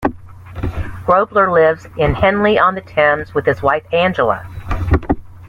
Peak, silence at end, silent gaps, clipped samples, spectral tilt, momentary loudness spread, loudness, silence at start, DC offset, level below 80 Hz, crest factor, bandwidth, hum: 0 dBFS; 0 s; none; under 0.1%; -7.5 dB/octave; 12 LU; -15 LUFS; 0 s; under 0.1%; -30 dBFS; 14 dB; 11.5 kHz; none